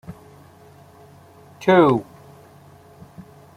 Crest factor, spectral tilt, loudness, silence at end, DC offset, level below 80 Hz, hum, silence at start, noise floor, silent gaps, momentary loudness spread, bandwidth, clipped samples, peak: 22 dB; -7.5 dB/octave; -17 LUFS; 0.35 s; under 0.1%; -60 dBFS; none; 0.1 s; -48 dBFS; none; 29 LU; 14.5 kHz; under 0.1%; -2 dBFS